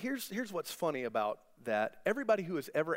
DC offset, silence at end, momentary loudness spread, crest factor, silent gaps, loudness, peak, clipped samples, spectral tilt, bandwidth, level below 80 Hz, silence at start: under 0.1%; 0 s; 6 LU; 18 dB; none; -35 LUFS; -18 dBFS; under 0.1%; -4.5 dB/octave; 16 kHz; -76 dBFS; 0 s